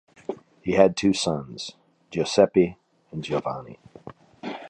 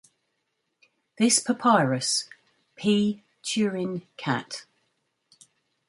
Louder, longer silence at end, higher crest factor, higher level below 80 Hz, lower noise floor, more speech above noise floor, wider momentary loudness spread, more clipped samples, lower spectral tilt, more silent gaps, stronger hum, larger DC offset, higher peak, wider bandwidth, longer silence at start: about the same, -23 LUFS vs -25 LUFS; second, 0 s vs 1.25 s; about the same, 22 dB vs 22 dB; first, -56 dBFS vs -72 dBFS; second, -46 dBFS vs -77 dBFS; second, 23 dB vs 53 dB; first, 19 LU vs 13 LU; neither; first, -5 dB/octave vs -3.5 dB/octave; neither; neither; neither; first, -2 dBFS vs -6 dBFS; about the same, 11 kHz vs 11.5 kHz; second, 0.3 s vs 1.2 s